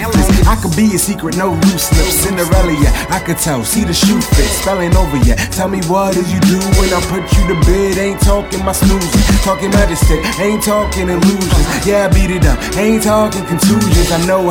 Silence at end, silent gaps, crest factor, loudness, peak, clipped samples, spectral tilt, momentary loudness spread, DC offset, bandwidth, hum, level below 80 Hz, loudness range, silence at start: 0 s; none; 12 dB; -12 LUFS; 0 dBFS; under 0.1%; -5 dB/octave; 4 LU; under 0.1%; 18.5 kHz; none; -16 dBFS; 1 LU; 0 s